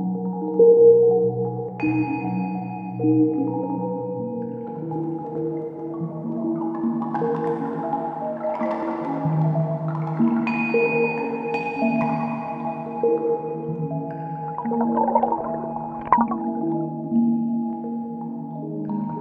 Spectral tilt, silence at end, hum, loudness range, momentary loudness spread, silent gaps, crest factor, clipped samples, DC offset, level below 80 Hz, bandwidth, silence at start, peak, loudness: -10.5 dB/octave; 0 s; none; 6 LU; 10 LU; none; 22 dB; under 0.1%; under 0.1%; -62 dBFS; 4.9 kHz; 0 s; -2 dBFS; -23 LUFS